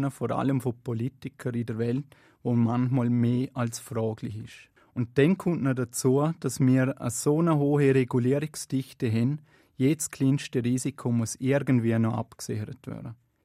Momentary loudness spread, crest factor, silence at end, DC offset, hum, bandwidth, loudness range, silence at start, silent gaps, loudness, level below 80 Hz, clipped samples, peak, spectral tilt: 12 LU; 18 dB; 0.3 s; under 0.1%; none; 15 kHz; 4 LU; 0 s; none; -27 LUFS; -64 dBFS; under 0.1%; -8 dBFS; -6.5 dB/octave